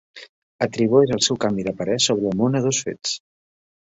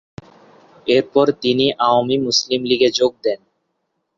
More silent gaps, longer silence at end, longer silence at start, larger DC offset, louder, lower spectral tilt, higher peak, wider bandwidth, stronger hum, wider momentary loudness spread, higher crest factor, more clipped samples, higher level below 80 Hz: first, 0.29-0.59 s vs none; about the same, 0.7 s vs 0.8 s; second, 0.15 s vs 0.85 s; neither; second, -21 LUFS vs -17 LUFS; about the same, -4 dB/octave vs -4 dB/octave; about the same, -4 dBFS vs -2 dBFS; about the same, 8.2 kHz vs 7.6 kHz; neither; about the same, 10 LU vs 9 LU; about the same, 18 dB vs 16 dB; neither; about the same, -56 dBFS vs -60 dBFS